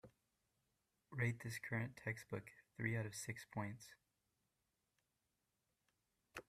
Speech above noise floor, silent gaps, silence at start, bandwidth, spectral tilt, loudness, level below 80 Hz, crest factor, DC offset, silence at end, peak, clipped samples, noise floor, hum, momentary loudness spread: 42 dB; none; 0.05 s; 15 kHz; -5.5 dB/octave; -46 LUFS; -78 dBFS; 24 dB; under 0.1%; 0.05 s; -26 dBFS; under 0.1%; -88 dBFS; none; 14 LU